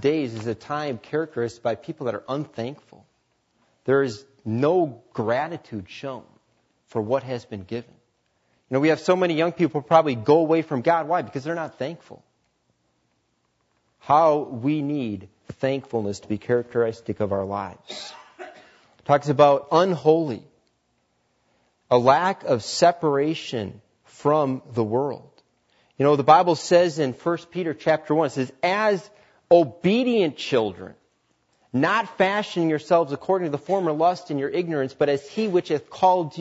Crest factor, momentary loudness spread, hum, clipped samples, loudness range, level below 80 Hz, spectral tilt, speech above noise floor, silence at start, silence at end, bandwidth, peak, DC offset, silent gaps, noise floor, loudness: 22 dB; 15 LU; none; under 0.1%; 7 LU; -68 dBFS; -6 dB/octave; 48 dB; 0 s; 0 s; 8 kHz; -2 dBFS; under 0.1%; none; -70 dBFS; -23 LUFS